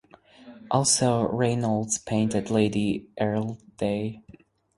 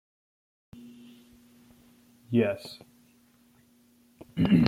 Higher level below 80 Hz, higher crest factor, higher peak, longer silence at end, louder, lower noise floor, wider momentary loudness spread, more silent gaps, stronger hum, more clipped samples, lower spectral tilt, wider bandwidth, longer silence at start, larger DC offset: first, -56 dBFS vs -62 dBFS; second, 18 dB vs 28 dB; second, -8 dBFS vs -4 dBFS; first, 0.55 s vs 0 s; first, -25 LUFS vs -28 LUFS; second, -50 dBFS vs -62 dBFS; second, 9 LU vs 27 LU; neither; neither; neither; second, -4.5 dB/octave vs -8 dB/octave; second, 11.5 kHz vs 15.5 kHz; second, 0.4 s vs 2.3 s; neither